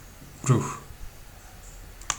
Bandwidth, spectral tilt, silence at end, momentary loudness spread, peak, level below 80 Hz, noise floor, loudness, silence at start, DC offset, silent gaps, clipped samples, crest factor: over 20 kHz; -5 dB/octave; 0 s; 22 LU; -8 dBFS; -46 dBFS; -46 dBFS; -27 LUFS; 0 s; under 0.1%; none; under 0.1%; 22 dB